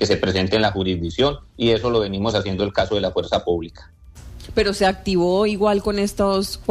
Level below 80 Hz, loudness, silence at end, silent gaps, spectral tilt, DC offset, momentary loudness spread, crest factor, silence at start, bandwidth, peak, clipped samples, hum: -38 dBFS; -20 LUFS; 0 s; none; -5.5 dB/octave; under 0.1%; 5 LU; 14 dB; 0 s; 14.5 kHz; -6 dBFS; under 0.1%; none